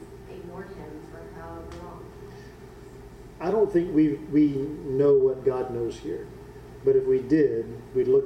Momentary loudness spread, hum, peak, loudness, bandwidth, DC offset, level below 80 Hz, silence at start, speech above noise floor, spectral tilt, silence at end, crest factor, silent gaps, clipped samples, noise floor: 23 LU; none; -10 dBFS; -24 LUFS; 9 kHz; under 0.1%; -50 dBFS; 0 s; 21 dB; -8.5 dB/octave; 0 s; 16 dB; none; under 0.1%; -45 dBFS